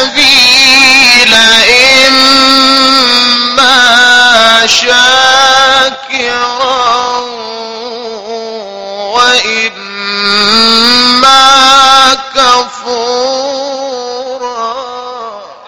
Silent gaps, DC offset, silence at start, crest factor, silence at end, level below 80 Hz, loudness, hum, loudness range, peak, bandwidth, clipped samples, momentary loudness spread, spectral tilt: none; under 0.1%; 0 s; 8 dB; 0.1 s; -42 dBFS; -4 LUFS; none; 10 LU; 0 dBFS; over 20 kHz; 3%; 18 LU; -0.5 dB/octave